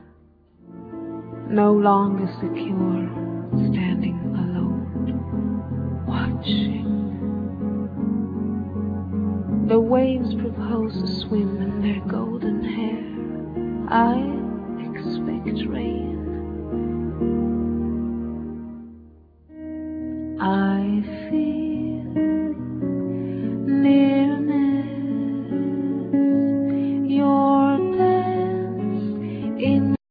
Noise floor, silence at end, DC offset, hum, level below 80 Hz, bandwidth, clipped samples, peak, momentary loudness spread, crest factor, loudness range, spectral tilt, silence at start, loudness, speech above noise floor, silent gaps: -54 dBFS; 0.15 s; under 0.1%; none; -44 dBFS; 5 kHz; under 0.1%; -6 dBFS; 11 LU; 18 dB; 6 LU; -10 dB/octave; 0.7 s; -23 LUFS; 33 dB; none